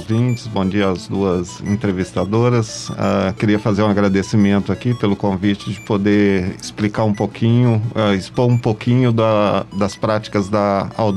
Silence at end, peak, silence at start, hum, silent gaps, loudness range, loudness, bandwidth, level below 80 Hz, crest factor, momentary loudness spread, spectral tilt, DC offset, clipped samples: 0 s; -4 dBFS; 0 s; none; none; 2 LU; -17 LUFS; 11 kHz; -48 dBFS; 14 dB; 6 LU; -7 dB/octave; under 0.1%; under 0.1%